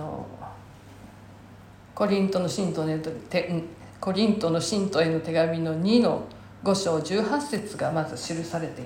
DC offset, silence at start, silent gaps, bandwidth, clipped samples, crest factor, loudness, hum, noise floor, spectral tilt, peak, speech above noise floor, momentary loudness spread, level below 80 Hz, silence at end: under 0.1%; 0 s; none; 16.5 kHz; under 0.1%; 18 dB; -26 LUFS; none; -48 dBFS; -5.5 dB/octave; -8 dBFS; 23 dB; 14 LU; -58 dBFS; 0 s